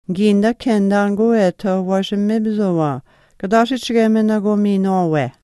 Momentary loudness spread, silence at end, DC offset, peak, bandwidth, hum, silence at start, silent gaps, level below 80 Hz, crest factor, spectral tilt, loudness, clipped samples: 4 LU; 0.15 s; under 0.1%; 0 dBFS; 12 kHz; none; 0.1 s; none; -54 dBFS; 16 dB; -7 dB/octave; -16 LUFS; under 0.1%